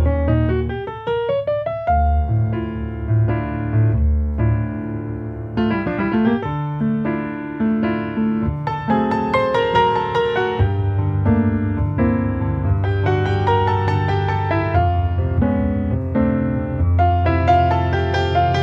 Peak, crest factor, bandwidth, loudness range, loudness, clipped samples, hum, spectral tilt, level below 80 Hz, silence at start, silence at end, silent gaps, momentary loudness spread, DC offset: -4 dBFS; 14 dB; 6.6 kHz; 3 LU; -19 LUFS; under 0.1%; none; -9 dB/octave; -28 dBFS; 0 s; 0 s; none; 6 LU; under 0.1%